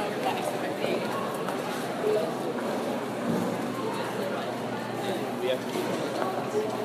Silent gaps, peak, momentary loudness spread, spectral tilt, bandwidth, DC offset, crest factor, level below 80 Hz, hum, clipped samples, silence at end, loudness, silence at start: none; -12 dBFS; 3 LU; -5 dB/octave; 15.5 kHz; under 0.1%; 18 dB; -72 dBFS; none; under 0.1%; 0 s; -30 LUFS; 0 s